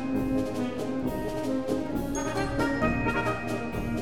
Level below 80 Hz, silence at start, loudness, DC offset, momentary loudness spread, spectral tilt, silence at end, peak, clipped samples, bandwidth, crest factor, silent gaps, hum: -42 dBFS; 0 s; -29 LUFS; 0.7%; 5 LU; -6 dB/octave; 0 s; -12 dBFS; under 0.1%; 18 kHz; 18 dB; none; none